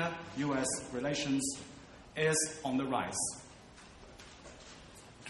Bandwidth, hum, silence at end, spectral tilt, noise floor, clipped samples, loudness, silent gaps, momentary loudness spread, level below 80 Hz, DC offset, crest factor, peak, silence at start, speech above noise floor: 11.5 kHz; none; 0 s; -3.5 dB/octave; -55 dBFS; under 0.1%; -34 LUFS; none; 22 LU; -62 dBFS; under 0.1%; 18 dB; -18 dBFS; 0 s; 21 dB